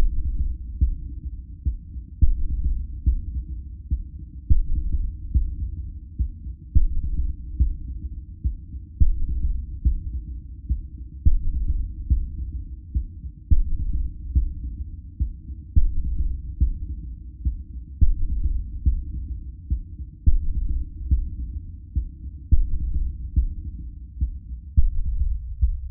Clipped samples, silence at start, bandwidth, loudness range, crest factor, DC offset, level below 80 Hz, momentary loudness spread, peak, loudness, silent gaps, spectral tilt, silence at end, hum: under 0.1%; 0 s; 0.4 kHz; 2 LU; 18 dB; under 0.1%; -24 dBFS; 12 LU; -4 dBFS; -29 LUFS; none; -18.5 dB/octave; 0 s; none